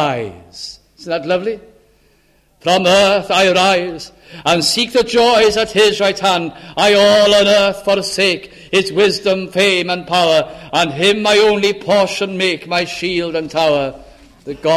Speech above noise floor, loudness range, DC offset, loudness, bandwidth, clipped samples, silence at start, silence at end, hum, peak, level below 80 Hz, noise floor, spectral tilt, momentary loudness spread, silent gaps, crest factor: 40 dB; 3 LU; under 0.1%; -14 LUFS; 15 kHz; under 0.1%; 0 s; 0 s; none; 0 dBFS; -48 dBFS; -54 dBFS; -3.5 dB/octave; 14 LU; none; 14 dB